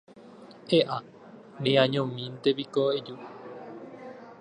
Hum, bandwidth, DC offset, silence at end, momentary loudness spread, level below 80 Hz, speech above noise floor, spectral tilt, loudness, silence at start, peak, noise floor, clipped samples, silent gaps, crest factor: none; 10 kHz; under 0.1%; 0.05 s; 21 LU; -74 dBFS; 23 dB; -6.5 dB/octave; -27 LUFS; 0.15 s; -6 dBFS; -49 dBFS; under 0.1%; none; 22 dB